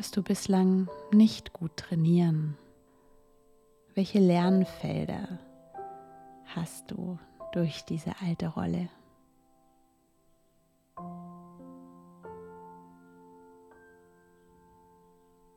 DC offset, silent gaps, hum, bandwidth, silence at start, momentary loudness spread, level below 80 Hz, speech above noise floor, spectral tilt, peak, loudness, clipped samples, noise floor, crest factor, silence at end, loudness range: under 0.1%; none; none; 14 kHz; 0 s; 26 LU; -64 dBFS; 41 dB; -7 dB/octave; -12 dBFS; -29 LUFS; under 0.1%; -68 dBFS; 18 dB; 2.75 s; 23 LU